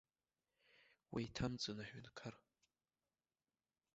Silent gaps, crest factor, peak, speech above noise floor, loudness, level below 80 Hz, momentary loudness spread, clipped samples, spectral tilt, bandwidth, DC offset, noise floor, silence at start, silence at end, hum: none; 22 dB; -30 dBFS; over 43 dB; -48 LUFS; -68 dBFS; 11 LU; under 0.1%; -4.5 dB/octave; 7.6 kHz; under 0.1%; under -90 dBFS; 0.75 s; 1.6 s; none